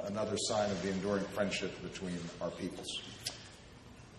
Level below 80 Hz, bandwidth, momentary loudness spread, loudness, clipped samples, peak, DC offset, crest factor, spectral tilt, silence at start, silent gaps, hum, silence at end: -62 dBFS; 12.5 kHz; 17 LU; -37 LUFS; under 0.1%; -20 dBFS; under 0.1%; 18 dB; -4 dB/octave; 0 s; none; none; 0 s